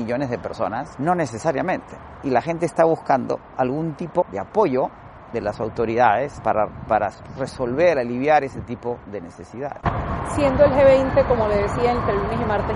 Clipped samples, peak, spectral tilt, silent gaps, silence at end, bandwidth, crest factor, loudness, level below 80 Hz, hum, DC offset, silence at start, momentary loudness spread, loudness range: under 0.1%; -2 dBFS; -7 dB/octave; none; 0 s; 11.5 kHz; 18 dB; -21 LUFS; -40 dBFS; none; under 0.1%; 0 s; 13 LU; 4 LU